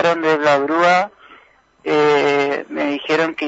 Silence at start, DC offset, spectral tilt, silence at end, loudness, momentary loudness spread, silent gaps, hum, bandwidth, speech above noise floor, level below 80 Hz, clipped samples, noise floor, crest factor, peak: 0 s; under 0.1%; -5 dB/octave; 0 s; -16 LUFS; 7 LU; none; none; 8 kHz; 35 dB; -66 dBFS; under 0.1%; -51 dBFS; 16 dB; -2 dBFS